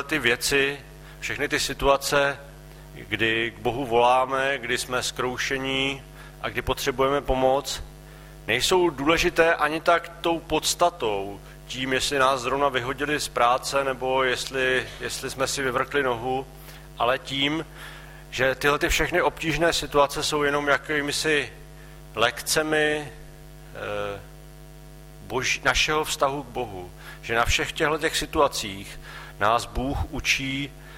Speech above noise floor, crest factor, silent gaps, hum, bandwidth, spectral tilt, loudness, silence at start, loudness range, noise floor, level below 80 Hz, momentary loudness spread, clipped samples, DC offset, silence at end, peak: 20 dB; 20 dB; none; none; 16 kHz; -3 dB/octave; -24 LUFS; 0 s; 4 LU; -44 dBFS; -42 dBFS; 15 LU; under 0.1%; under 0.1%; 0 s; -6 dBFS